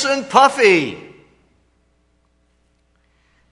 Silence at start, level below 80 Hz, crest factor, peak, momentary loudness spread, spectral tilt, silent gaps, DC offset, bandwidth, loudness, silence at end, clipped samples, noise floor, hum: 0 s; -62 dBFS; 20 dB; 0 dBFS; 17 LU; -3.5 dB/octave; none; under 0.1%; 11 kHz; -14 LUFS; 2.5 s; under 0.1%; -61 dBFS; 60 Hz at -60 dBFS